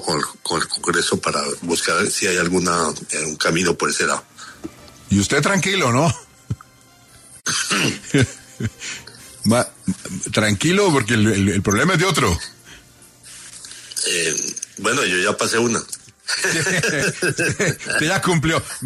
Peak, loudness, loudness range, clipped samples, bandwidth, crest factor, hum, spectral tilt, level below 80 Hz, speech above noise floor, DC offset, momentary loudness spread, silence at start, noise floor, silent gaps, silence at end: -2 dBFS; -19 LUFS; 4 LU; under 0.1%; 13.5 kHz; 18 dB; none; -3.5 dB/octave; -46 dBFS; 30 dB; under 0.1%; 16 LU; 0 s; -49 dBFS; none; 0 s